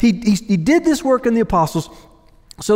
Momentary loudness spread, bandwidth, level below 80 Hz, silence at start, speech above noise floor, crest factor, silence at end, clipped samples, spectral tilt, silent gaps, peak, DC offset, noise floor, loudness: 11 LU; 16 kHz; -40 dBFS; 0 s; 25 dB; 14 dB; 0 s; under 0.1%; -6 dB/octave; none; -4 dBFS; under 0.1%; -41 dBFS; -16 LUFS